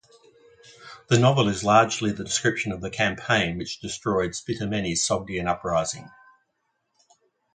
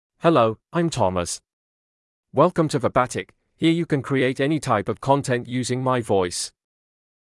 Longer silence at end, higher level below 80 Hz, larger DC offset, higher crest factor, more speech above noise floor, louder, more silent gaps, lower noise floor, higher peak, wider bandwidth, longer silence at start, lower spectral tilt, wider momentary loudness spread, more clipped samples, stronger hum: first, 1.45 s vs 0.85 s; about the same, -52 dBFS vs -56 dBFS; neither; about the same, 22 dB vs 18 dB; second, 51 dB vs over 69 dB; about the same, -24 LUFS vs -22 LUFS; second, none vs 1.53-2.23 s; second, -75 dBFS vs under -90 dBFS; about the same, -4 dBFS vs -4 dBFS; second, 9.6 kHz vs 12 kHz; first, 0.8 s vs 0.25 s; second, -4 dB/octave vs -5.5 dB/octave; first, 12 LU vs 9 LU; neither; neither